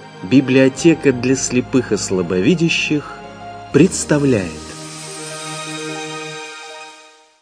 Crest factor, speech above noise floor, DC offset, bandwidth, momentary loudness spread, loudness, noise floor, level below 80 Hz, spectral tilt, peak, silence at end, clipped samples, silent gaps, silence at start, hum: 18 dB; 30 dB; under 0.1%; 10.5 kHz; 18 LU; -16 LUFS; -45 dBFS; -46 dBFS; -5 dB/octave; 0 dBFS; 0.4 s; under 0.1%; none; 0 s; none